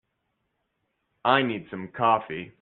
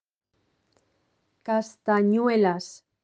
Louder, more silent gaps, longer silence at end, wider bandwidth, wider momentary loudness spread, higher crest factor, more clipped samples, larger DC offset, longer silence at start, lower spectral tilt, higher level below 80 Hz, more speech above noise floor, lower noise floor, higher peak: about the same, -25 LUFS vs -24 LUFS; neither; second, 0.1 s vs 0.3 s; second, 4.4 kHz vs 9 kHz; second, 13 LU vs 16 LU; first, 24 dB vs 16 dB; neither; neither; second, 1.25 s vs 1.45 s; second, -2.5 dB/octave vs -6.5 dB/octave; first, -68 dBFS vs -78 dBFS; about the same, 52 dB vs 49 dB; first, -77 dBFS vs -72 dBFS; first, -4 dBFS vs -10 dBFS